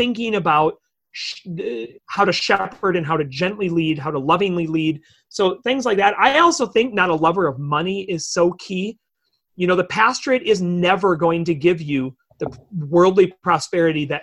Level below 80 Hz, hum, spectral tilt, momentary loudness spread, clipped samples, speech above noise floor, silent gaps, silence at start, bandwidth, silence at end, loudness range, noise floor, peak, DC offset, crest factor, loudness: -56 dBFS; none; -5 dB/octave; 13 LU; under 0.1%; 53 dB; none; 0 s; 11 kHz; 0 s; 3 LU; -71 dBFS; -2 dBFS; under 0.1%; 16 dB; -19 LUFS